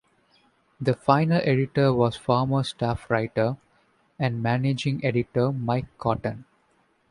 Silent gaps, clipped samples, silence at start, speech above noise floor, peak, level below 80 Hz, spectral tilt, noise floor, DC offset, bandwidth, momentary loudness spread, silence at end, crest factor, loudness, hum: none; under 0.1%; 0.8 s; 42 dB; -4 dBFS; -52 dBFS; -7.5 dB/octave; -66 dBFS; under 0.1%; 11 kHz; 8 LU; 0.7 s; 22 dB; -25 LUFS; none